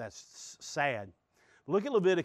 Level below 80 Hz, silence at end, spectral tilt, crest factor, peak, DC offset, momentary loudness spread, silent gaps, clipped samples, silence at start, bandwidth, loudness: -76 dBFS; 0 s; -5 dB/octave; 18 dB; -16 dBFS; under 0.1%; 21 LU; none; under 0.1%; 0 s; 10 kHz; -32 LUFS